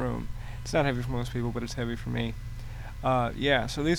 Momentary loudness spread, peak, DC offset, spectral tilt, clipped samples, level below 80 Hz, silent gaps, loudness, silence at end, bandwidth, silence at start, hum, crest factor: 14 LU; -10 dBFS; under 0.1%; -5.5 dB/octave; under 0.1%; -40 dBFS; none; -30 LUFS; 0 s; 19 kHz; 0 s; none; 20 dB